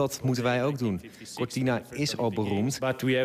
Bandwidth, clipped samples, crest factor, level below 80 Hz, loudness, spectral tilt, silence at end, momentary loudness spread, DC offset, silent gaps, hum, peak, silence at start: 15.5 kHz; under 0.1%; 14 dB; -64 dBFS; -29 LUFS; -5.5 dB/octave; 0 s; 7 LU; under 0.1%; none; none; -14 dBFS; 0 s